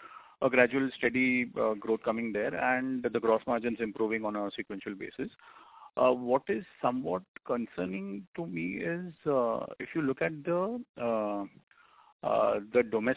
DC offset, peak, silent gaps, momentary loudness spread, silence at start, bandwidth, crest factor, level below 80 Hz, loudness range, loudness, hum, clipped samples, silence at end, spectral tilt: under 0.1%; -10 dBFS; 7.28-7.34 s, 8.27-8.33 s, 10.89-10.94 s, 11.63-11.67 s, 12.12-12.20 s; 12 LU; 0 s; 4 kHz; 22 dB; -68 dBFS; 5 LU; -31 LUFS; none; under 0.1%; 0 s; -4.5 dB/octave